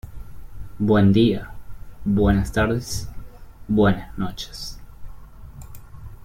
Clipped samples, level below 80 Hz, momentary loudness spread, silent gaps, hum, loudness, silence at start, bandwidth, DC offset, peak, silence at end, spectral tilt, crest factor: under 0.1%; -36 dBFS; 26 LU; none; none; -21 LUFS; 0.05 s; 16 kHz; under 0.1%; -6 dBFS; 0 s; -6.5 dB/octave; 18 dB